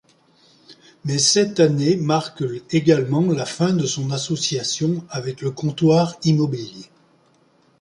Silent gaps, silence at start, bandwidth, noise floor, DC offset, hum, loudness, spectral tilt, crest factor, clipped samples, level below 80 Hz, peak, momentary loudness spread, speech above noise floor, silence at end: none; 0.7 s; 11.5 kHz; -58 dBFS; under 0.1%; none; -20 LUFS; -5 dB/octave; 18 dB; under 0.1%; -60 dBFS; -4 dBFS; 11 LU; 39 dB; 0.95 s